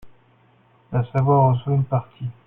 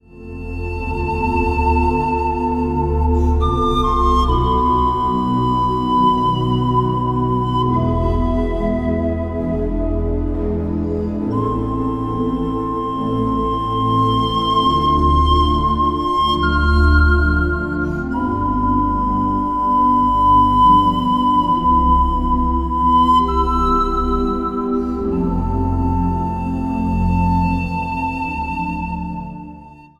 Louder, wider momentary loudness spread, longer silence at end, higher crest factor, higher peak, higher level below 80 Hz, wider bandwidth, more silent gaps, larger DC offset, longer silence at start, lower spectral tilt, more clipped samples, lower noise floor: second, -20 LUFS vs -17 LUFS; about the same, 10 LU vs 8 LU; about the same, 0.15 s vs 0.2 s; about the same, 16 dB vs 14 dB; second, -6 dBFS vs -2 dBFS; second, -52 dBFS vs -24 dBFS; second, 3.6 kHz vs 8.6 kHz; neither; neither; about the same, 0.05 s vs 0.15 s; first, -11 dB/octave vs -8 dB/octave; neither; first, -57 dBFS vs -39 dBFS